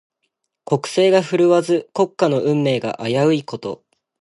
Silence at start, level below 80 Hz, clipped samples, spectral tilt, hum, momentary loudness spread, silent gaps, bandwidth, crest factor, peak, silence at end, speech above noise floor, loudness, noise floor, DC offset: 0.7 s; -66 dBFS; under 0.1%; -6 dB/octave; none; 12 LU; none; 11.5 kHz; 16 dB; -2 dBFS; 0.45 s; 56 dB; -18 LUFS; -74 dBFS; under 0.1%